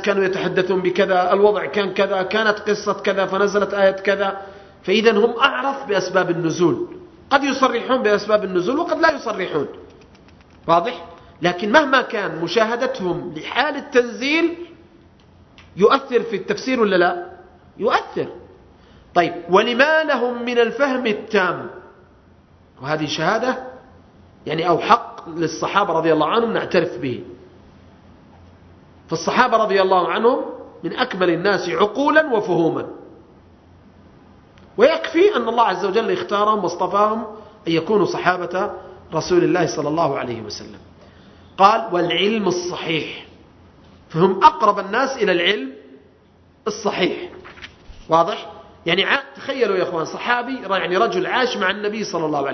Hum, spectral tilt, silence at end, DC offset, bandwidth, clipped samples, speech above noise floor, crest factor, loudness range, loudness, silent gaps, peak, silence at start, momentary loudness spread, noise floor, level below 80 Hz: none; -5 dB/octave; 0 s; under 0.1%; 6.4 kHz; under 0.1%; 34 dB; 20 dB; 4 LU; -19 LUFS; none; 0 dBFS; 0 s; 14 LU; -52 dBFS; -56 dBFS